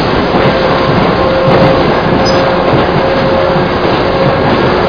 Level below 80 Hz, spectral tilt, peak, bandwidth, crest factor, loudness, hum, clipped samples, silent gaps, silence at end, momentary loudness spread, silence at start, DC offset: -26 dBFS; -7 dB/octave; 0 dBFS; 5.4 kHz; 8 dB; -9 LUFS; none; 0.3%; none; 0 s; 3 LU; 0 s; 1%